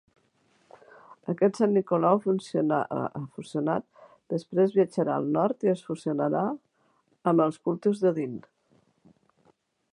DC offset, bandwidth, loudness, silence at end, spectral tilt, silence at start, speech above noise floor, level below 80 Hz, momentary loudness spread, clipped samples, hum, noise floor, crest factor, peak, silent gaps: under 0.1%; 11 kHz; -27 LUFS; 1.55 s; -8 dB/octave; 1.25 s; 43 dB; -74 dBFS; 11 LU; under 0.1%; none; -68 dBFS; 20 dB; -8 dBFS; none